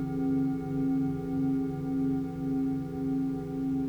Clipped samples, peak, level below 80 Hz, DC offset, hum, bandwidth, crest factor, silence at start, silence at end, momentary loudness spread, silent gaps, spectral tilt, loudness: under 0.1%; -20 dBFS; -52 dBFS; under 0.1%; none; 5.6 kHz; 10 dB; 0 s; 0 s; 3 LU; none; -10 dB/octave; -31 LUFS